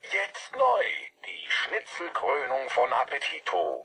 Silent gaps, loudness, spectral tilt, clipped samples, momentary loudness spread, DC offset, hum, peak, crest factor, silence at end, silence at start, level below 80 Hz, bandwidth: none; -28 LUFS; -1 dB/octave; under 0.1%; 9 LU; under 0.1%; none; -12 dBFS; 16 dB; 0 s; 0.05 s; -78 dBFS; 10.5 kHz